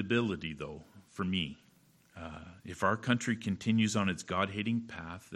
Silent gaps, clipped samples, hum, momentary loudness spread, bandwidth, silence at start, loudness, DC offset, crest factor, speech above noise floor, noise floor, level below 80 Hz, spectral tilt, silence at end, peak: none; under 0.1%; none; 17 LU; 12.5 kHz; 0 s; -33 LUFS; under 0.1%; 20 dB; 32 dB; -65 dBFS; -62 dBFS; -5 dB/octave; 0 s; -14 dBFS